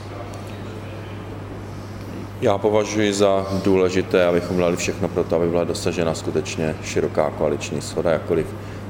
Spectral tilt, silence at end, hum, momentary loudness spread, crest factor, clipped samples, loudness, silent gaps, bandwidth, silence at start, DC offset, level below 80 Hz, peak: -5.5 dB/octave; 0 s; none; 15 LU; 18 dB; under 0.1%; -21 LUFS; none; 16.5 kHz; 0 s; under 0.1%; -46 dBFS; -4 dBFS